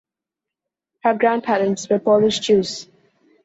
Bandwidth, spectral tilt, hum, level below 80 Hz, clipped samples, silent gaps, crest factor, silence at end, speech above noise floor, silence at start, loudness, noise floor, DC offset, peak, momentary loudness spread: 8 kHz; -4.5 dB/octave; none; -60 dBFS; under 0.1%; none; 16 dB; 0.6 s; 68 dB; 1.05 s; -18 LUFS; -86 dBFS; under 0.1%; -4 dBFS; 7 LU